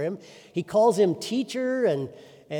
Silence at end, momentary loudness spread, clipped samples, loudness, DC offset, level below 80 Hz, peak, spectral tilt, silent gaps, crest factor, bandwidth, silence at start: 0 s; 13 LU; under 0.1%; -25 LUFS; under 0.1%; -72 dBFS; -10 dBFS; -5.5 dB/octave; none; 16 dB; 18.5 kHz; 0 s